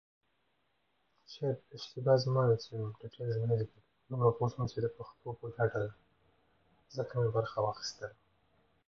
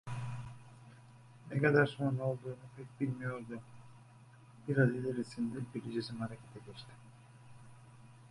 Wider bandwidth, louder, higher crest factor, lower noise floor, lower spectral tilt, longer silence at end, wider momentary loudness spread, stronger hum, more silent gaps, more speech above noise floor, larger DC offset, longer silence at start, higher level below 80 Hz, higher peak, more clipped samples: second, 7 kHz vs 11.5 kHz; about the same, -35 LUFS vs -36 LUFS; about the same, 20 dB vs 24 dB; first, -78 dBFS vs -59 dBFS; about the same, -7 dB/octave vs -7.5 dB/octave; first, 0.75 s vs 0 s; second, 15 LU vs 27 LU; neither; neither; first, 44 dB vs 23 dB; neither; first, 1.3 s vs 0.05 s; about the same, -66 dBFS vs -70 dBFS; about the same, -14 dBFS vs -14 dBFS; neither